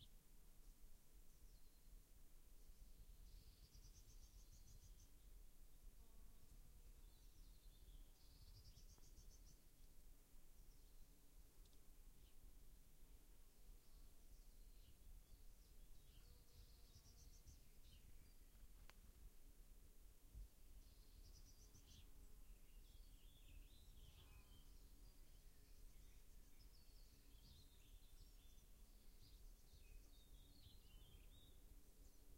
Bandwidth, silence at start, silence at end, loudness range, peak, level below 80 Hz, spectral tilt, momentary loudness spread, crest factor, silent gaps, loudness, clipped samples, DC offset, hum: 16 kHz; 0 s; 0 s; 1 LU; -44 dBFS; -66 dBFS; -3.5 dB/octave; 2 LU; 20 dB; none; -69 LUFS; under 0.1%; under 0.1%; none